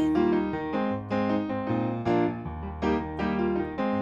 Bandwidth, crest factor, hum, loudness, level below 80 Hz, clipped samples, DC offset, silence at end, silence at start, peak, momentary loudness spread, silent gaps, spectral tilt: 7.4 kHz; 14 dB; none; -28 LUFS; -46 dBFS; under 0.1%; under 0.1%; 0 s; 0 s; -14 dBFS; 4 LU; none; -8.5 dB/octave